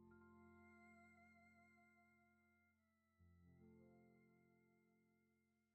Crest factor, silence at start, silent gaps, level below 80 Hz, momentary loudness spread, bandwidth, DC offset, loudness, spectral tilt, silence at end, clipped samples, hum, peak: 16 dB; 0 s; none; under -90 dBFS; 1 LU; 8 kHz; under 0.1%; -69 LUFS; -6 dB/octave; 0 s; under 0.1%; none; -56 dBFS